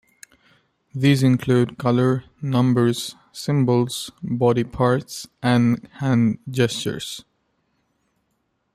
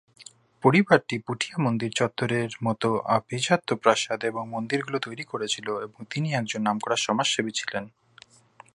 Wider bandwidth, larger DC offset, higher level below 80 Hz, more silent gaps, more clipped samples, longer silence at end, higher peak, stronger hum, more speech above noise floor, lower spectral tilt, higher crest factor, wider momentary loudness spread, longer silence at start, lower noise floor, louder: first, 14.5 kHz vs 11.5 kHz; neither; first, -56 dBFS vs -68 dBFS; neither; neither; first, 1.55 s vs 0.85 s; about the same, -4 dBFS vs -2 dBFS; neither; first, 51 dB vs 29 dB; first, -6.5 dB/octave vs -4.5 dB/octave; second, 16 dB vs 24 dB; about the same, 12 LU vs 10 LU; first, 0.95 s vs 0.2 s; first, -71 dBFS vs -55 dBFS; first, -21 LUFS vs -26 LUFS